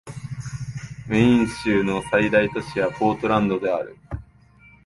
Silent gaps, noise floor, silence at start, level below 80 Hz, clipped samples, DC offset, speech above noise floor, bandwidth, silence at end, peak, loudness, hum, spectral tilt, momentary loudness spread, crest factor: none; -52 dBFS; 0.05 s; -46 dBFS; under 0.1%; under 0.1%; 31 dB; 11.5 kHz; 0.65 s; -4 dBFS; -21 LUFS; none; -6.5 dB/octave; 17 LU; 18 dB